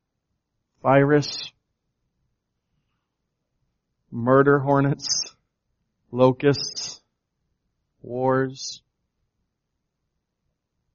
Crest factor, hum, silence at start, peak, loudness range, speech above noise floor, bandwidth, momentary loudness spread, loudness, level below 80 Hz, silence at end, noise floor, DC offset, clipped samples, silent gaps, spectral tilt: 22 dB; none; 0.85 s; -2 dBFS; 9 LU; 59 dB; 7.2 kHz; 17 LU; -21 LUFS; -62 dBFS; 2.15 s; -79 dBFS; under 0.1%; under 0.1%; none; -5 dB/octave